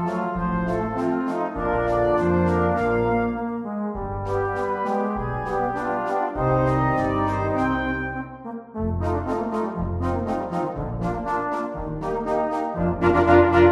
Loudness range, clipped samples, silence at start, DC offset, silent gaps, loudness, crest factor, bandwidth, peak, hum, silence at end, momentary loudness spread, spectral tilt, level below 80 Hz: 4 LU; under 0.1%; 0 s; under 0.1%; none; -23 LUFS; 20 dB; 10 kHz; -2 dBFS; none; 0 s; 8 LU; -8.5 dB/octave; -38 dBFS